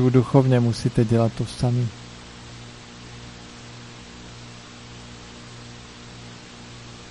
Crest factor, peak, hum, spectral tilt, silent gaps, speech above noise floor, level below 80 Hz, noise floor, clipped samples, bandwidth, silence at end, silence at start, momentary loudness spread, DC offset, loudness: 20 dB; -4 dBFS; 60 Hz at -45 dBFS; -7 dB/octave; none; 22 dB; -48 dBFS; -41 dBFS; under 0.1%; 11.5 kHz; 0 s; 0 s; 22 LU; under 0.1%; -21 LUFS